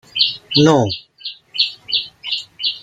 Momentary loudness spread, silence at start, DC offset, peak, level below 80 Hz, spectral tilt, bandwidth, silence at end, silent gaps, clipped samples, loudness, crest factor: 13 LU; 0.15 s; under 0.1%; 0 dBFS; -56 dBFS; -5 dB/octave; 9.2 kHz; 0 s; none; under 0.1%; -17 LUFS; 18 dB